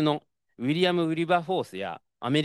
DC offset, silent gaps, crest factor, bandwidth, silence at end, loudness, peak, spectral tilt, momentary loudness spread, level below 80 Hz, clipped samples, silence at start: under 0.1%; none; 18 dB; 12.5 kHz; 0 s; -27 LUFS; -10 dBFS; -6.5 dB/octave; 11 LU; -76 dBFS; under 0.1%; 0 s